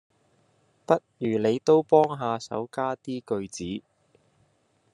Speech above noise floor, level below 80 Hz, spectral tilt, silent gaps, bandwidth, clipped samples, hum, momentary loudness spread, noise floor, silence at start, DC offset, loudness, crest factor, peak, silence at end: 43 dB; -74 dBFS; -6 dB/octave; none; 10.5 kHz; under 0.1%; none; 14 LU; -68 dBFS; 0.9 s; under 0.1%; -26 LUFS; 22 dB; -6 dBFS; 1.15 s